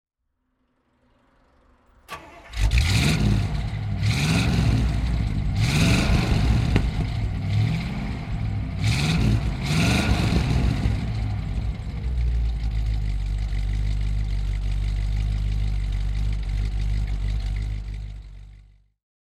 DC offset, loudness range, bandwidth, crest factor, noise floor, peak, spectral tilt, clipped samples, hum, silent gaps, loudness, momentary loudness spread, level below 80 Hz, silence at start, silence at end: under 0.1%; 5 LU; 13.5 kHz; 22 dB; -74 dBFS; -2 dBFS; -5.5 dB/octave; under 0.1%; none; none; -24 LUFS; 9 LU; -26 dBFS; 2.1 s; 0.8 s